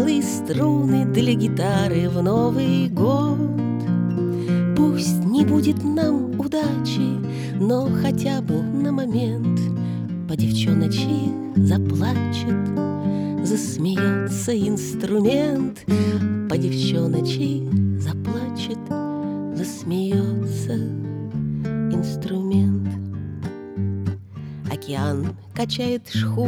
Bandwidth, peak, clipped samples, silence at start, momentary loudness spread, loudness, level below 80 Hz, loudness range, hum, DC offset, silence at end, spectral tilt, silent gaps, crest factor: 17.5 kHz; -4 dBFS; under 0.1%; 0 s; 8 LU; -22 LUFS; -52 dBFS; 5 LU; none; under 0.1%; 0 s; -7 dB/octave; none; 16 dB